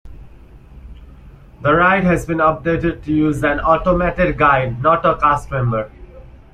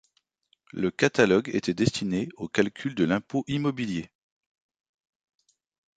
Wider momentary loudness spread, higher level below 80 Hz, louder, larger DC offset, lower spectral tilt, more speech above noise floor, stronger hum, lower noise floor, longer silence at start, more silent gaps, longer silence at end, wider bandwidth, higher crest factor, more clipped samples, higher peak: about the same, 7 LU vs 9 LU; first, -34 dBFS vs -58 dBFS; first, -16 LUFS vs -26 LUFS; neither; first, -7.5 dB/octave vs -5.5 dB/octave; second, 25 dB vs 44 dB; neither; second, -41 dBFS vs -70 dBFS; second, 0.05 s vs 0.75 s; neither; second, 0.3 s vs 1.9 s; first, 13.5 kHz vs 9.4 kHz; second, 16 dB vs 22 dB; neither; first, 0 dBFS vs -6 dBFS